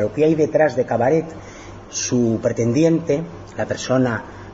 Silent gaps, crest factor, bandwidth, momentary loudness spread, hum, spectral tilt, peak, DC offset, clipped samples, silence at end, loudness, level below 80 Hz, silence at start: none; 14 dB; 8 kHz; 15 LU; none; -5.5 dB/octave; -4 dBFS; under 0.1%; under 0.1%; 0 s; -19 LUFS; -48 dBFS; 0 s